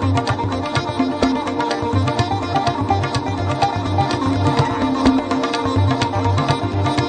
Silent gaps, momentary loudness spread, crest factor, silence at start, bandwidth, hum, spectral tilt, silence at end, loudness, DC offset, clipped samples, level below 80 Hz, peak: none; 4 LU; 18 dB; 0 s; 9.4 kHz; none; -6.5 dB/octave; 0 s; -19 LUFS; under 0.1%; under 0.1%; -38 dBFS; 0 dBFS